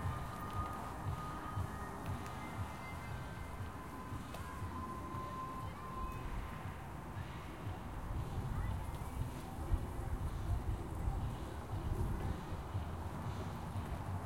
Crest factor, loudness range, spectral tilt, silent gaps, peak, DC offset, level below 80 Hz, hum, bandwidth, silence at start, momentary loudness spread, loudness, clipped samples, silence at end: 18 dB; 3 LU; -6.5 dB/octave; none; -24 dBFS; 0.1%; -48 dBFS; none; 16.5 kHz; 0 s; 6 LU; -44 LUFS; under 0.1%; 0 s